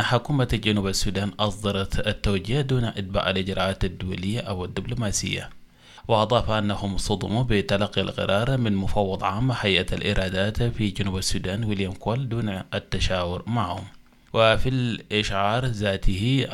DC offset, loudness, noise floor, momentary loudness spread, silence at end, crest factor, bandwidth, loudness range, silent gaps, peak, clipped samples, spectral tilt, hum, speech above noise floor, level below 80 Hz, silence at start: under 0.1%; -25 LUFS; -47 dBFS; 7 LU; 0 s; 20 dB; 15 kHz; 3 LU; none; -4 dBFS; under 0.1%; -5 dB/octave; none; 23 dB; -36 dBFS; 0 s